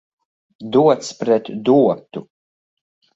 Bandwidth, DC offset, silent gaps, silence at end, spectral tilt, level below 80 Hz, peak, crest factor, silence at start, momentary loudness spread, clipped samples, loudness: 8 kHz; under 0.1%; none; 0.95 s; -6.5 dB/octave; -64 dBFS; -2 dBFS; 18 dB; 0.6 s; 19 LU; under 0.1%; -17 LUFS